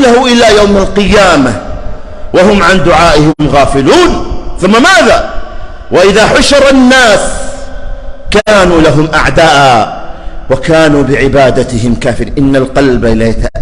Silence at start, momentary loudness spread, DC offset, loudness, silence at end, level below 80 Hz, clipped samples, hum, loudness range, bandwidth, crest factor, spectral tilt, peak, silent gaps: 0 s; 19 LU; under 0.1%; -6 LUFS; 0 s; -20 dBFS; 2%; none; 2 LU; 15.5 kHz; 6 dB; -4.5 dB/octave; 0 dBFS; none